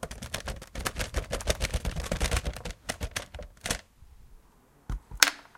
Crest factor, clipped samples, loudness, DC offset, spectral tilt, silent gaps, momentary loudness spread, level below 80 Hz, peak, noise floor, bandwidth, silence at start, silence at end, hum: 32 dB; under 0.1%; -32 LUFS; under 0.1%; -2.5 dB/octave; none; 16 LU; -38 dBFS; 0 dBFS; -60 dBFS; 17 kHz; 0 s; 0.15 s; none